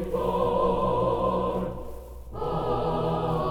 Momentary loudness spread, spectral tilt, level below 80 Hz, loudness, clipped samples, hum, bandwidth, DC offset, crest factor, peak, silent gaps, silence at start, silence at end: 15 LU; -8 dB/octave; -40 dBFS; -27 LUFS; under 0.1%; none; 17.5 kHz; under 0.1%; 14 dB; -12 dBFS; none; 0 s; 0 s